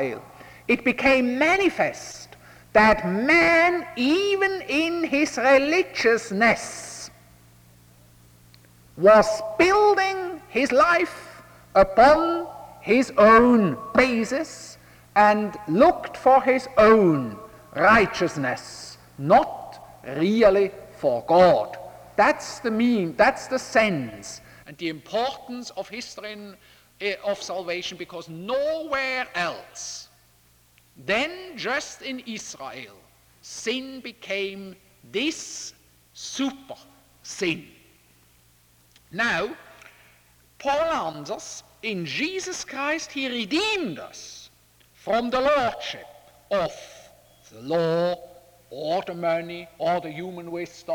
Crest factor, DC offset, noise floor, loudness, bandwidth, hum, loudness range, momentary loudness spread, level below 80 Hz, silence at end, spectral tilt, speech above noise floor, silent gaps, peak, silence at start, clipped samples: 20 dB; under 0.1%; -59 dBFS; -22 LUFS; over 20 kHz; none; 12 LU; 20 LU; -52 dBFS; 0 s; -4.5 dB/octave; 37 dB; none; -4 dBFS; 0 s; under 0.1%